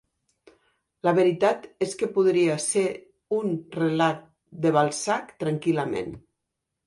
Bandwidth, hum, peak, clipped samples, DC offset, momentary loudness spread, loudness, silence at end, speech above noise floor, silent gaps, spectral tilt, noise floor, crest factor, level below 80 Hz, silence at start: 11.5 kHz; none; -6 dBFS; under 0.1%; under 0.1%; 9 LU; -25 LUFS; 0.7 s; 59 dB; none; -5 dB/octave; -83 dBFS; 20 dB; -64 dBFS; 1.05 s